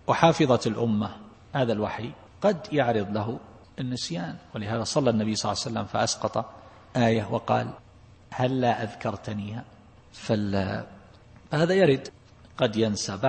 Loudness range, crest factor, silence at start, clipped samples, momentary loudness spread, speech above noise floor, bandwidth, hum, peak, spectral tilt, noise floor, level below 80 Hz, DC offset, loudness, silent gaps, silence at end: 3 LU; 24 dB; 0.1 s; under 0.1%; 15 LU; 26 dB; 8.8 kHz; none; -2 dBFS; -5.5 dB/octave; -51 dBFS; -58 dBFS; under 0.1%; -27 LUFS; none; 0 s